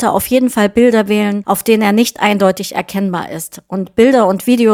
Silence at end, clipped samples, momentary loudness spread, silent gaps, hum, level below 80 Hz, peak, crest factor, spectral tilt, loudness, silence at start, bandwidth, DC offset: 0 s; under 0.1%; 10 LU; none; none; -48 dBFS; 0 dBFS; 12 dB; -5 dB/octave; -13 LUFS; 0 s; 19.5 kHz; under 0.1%